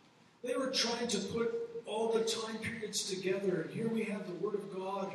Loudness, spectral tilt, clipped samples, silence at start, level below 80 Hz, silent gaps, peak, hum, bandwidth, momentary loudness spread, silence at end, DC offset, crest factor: -36 LUFS; -3.5 dB/octave; under 0.1%; 0.45 s; -78 dBFS; none; -20 dBFS; none; 14.5 kHz; 7 LU; 0 s; under 0.1%; 16 dB